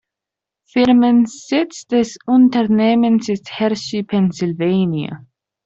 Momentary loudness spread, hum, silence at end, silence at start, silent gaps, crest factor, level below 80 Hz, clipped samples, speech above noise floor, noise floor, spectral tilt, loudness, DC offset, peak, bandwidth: 10 LU; none; 0.5 s; 0.75 s; none; 14 dB; -56 dBFS; under 0.1%; 70 dB; -85 dBFS; -6.5 dB/octave; -16 LUFS; under 0.1%; -4 dBFS; 7.8 kHz